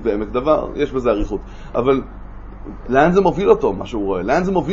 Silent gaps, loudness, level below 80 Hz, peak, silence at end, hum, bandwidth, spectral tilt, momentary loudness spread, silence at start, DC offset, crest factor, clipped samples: none; -18 LUFS; -32 dBFS; 0 dBFS; 0 s; none; 7.6 kHz; -7.5 dB/octave; 21 LU; 0 s; under 0.1%; 18 dB; under 0.1%